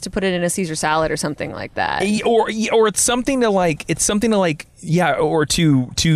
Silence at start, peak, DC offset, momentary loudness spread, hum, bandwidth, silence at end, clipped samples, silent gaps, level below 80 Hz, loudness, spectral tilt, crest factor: 0 s; -6 dBFS; under 0.1%; 6 LU; none; 14 kHz; 0 s; under 0.1%; none; -42 dBFS; -18 LUFS; -4 dB/octave; 12 dB